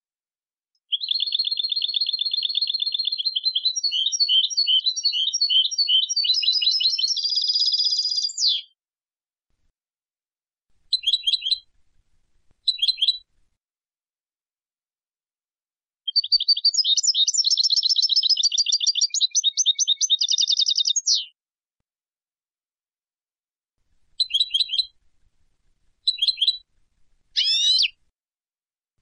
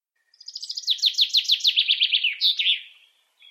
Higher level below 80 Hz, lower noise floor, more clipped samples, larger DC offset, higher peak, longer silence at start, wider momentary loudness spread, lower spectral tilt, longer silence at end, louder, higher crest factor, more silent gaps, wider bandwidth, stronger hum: first, -72 dBFS vs under -90 dBFS; first, under -90 dBFS vs -58 dBFS; neither; neither; about the same, -10 dBFS vs -8 dBFS; first, 0.9 s vs 0.5 s; second, 6 LU vs 12 LU; first, 8.5 dB/octave vs 12 dB/octave; first, 1.1 s vs 0.6 s; about the same, -19 LUFS vs -19 LUFS; about the same, 14 dB vs 16 dB; first, 14.20-14.24 s vs none; second, 10 kHz vs 15.5 kHz; neither